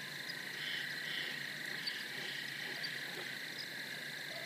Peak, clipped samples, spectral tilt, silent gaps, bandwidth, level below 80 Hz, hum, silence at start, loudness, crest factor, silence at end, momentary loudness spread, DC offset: -26 dBFS; under 0.1%; -1.5 dB/octave; none; 15.5 kHz; -90 dBFS; none; 0 s; -41 LUFS; 16 dB; 0 s; 4 LU; under 0.1%